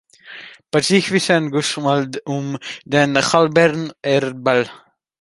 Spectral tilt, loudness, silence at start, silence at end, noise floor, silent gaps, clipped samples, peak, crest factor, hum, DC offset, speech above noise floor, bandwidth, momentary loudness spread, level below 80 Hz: -4.5 dB/octave; -17 LUFS; 0.25 s; 0.45 s; -39 dBFS; none; under 0.1%; 0 dBFS; 18 dB; none; under 0.1%; 22 dB; 11.5 kHz; 14 LU; -60 dBFS